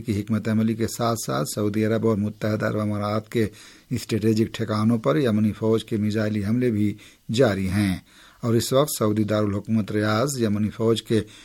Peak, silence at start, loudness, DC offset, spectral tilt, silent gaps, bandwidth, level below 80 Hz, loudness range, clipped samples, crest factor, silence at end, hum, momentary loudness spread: -6 dBFS; 0 s; -23 LUFS; under 0.1%; -6 dB/octave; none; 17 kHz; -54 dBFS; 2 LU; under 0.1%; 16 dB; 0 s; none; 5 LU